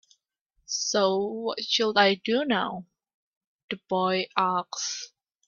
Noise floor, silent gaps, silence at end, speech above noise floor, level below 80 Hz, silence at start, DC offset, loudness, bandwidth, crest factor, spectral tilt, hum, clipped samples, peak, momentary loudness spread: -74 dBFS; 3.14-3.41 s, 3.47-3.68 s; 0.4 s; 48 dB; -72 dBFS; 0.7 s; under 0.1%; -26 LUFS; 7.6 kHz; 24 dB; -3 dB/octave; none; under 0.1%; -4 dBFS; 14 LU